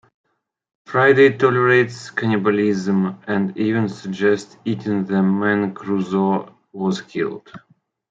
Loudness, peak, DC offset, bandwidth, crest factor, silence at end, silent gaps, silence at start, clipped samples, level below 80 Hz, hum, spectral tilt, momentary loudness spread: -19 LUFS; -2 dBFS; under 0.1%; 7.8 kHz; 18 dB; 0.55 s; none; 0.9 s; under 0.1%; -66 dBFS; none; -7 dB/octave; 11 LU